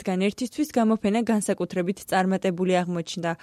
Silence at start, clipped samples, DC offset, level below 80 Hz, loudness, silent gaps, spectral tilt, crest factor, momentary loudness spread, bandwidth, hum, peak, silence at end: 0 s; under 0.1%; under 0.1%; -62 dBFS; -25 LUFS; none; -5.5 dB/octave; 14 dB; 6 LU; 14 kHz; none; -10 dBFS; 0.05 s